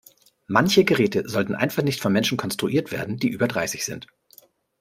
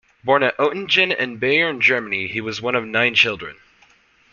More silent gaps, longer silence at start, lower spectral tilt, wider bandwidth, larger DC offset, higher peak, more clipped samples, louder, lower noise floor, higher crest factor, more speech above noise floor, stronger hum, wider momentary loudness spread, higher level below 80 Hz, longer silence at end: neither; first, 0.5 s vs 0.25 s; about the same, -4.5 dB/octave vs -4 dB/octave; first, 16 kHz vs 7.2 kHz; neither; about the same, -2 dBFS vs -2 dBFS; neither; second, -22 LUFS vs -18 LUFS; about the same, -55 dBFS vs -55 dBFS; about the same, 22 dB vs 20 dB; second, 32 dB vs 36 dB; neither; about the same, 9 LU vs 9 LU; about the same, -60 dBFS vs -60 dBFS; about the same, 0.75 s vs 0.8 s